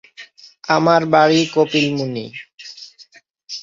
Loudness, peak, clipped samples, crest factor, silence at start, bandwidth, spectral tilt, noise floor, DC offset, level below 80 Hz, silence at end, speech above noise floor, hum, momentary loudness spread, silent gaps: -16 LUFS; -2 dBFS; under 0.1%; 18 dB; 0.2 s; 7.6 kHz; -5 dB/octave; -48 dBFS; under 0.1%; -62 dBFS; 0 s; 33 dB; none; 22 LU; 2.54-2.58 s